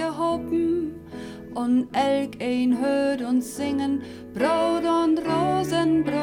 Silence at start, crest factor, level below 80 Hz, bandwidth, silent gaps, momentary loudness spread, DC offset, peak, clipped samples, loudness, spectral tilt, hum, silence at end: 0 s; 14 dB; -54 dBFS; 16.5 kHz; none; 9 LU; under 0.1%; -10 dBFS; under 0.1%; -24 LUFS; -5.5 dB/octave; none; 0 s